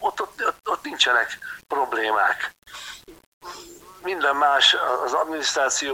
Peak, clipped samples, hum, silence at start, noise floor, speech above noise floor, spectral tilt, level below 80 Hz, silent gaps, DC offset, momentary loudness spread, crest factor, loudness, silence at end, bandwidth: -4 dBFS; under 0.1%; none; 0 s; -43 dBFS; 21 dB; 0.5 dB/octave; -62 dBFS; 3.26-3.41 s; under 0.1%; 22 LU; 20 dB; -21 LUFS; 0 s; 17 kHz